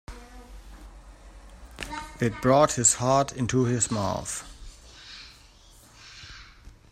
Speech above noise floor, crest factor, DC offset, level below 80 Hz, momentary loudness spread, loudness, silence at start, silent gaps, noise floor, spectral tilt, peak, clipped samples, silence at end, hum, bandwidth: 29 dB; 20 dB; under 0.1%; -48 dBFS; 26 LU; -24 LUFS; 0.1 s; none; -53 dBFS; -4 dB/octave; -8 dBFS; under 0.1%; 0.25 s; none; 15.5 kHz